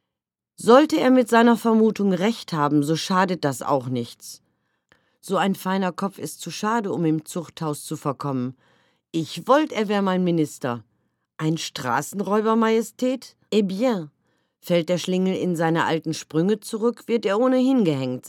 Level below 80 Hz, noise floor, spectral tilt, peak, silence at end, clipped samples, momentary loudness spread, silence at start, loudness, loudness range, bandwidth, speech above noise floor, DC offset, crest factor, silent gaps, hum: -76 dBFS; -86 dBFS; -5.5 dB/octave; 0 dBFS; 0 s; under 0.1%; 12 LU; 0.6 s; -22 LUFS; 7 LU; 17.5 kHz; 65 dB; under 0.1%; 22 dB; none; none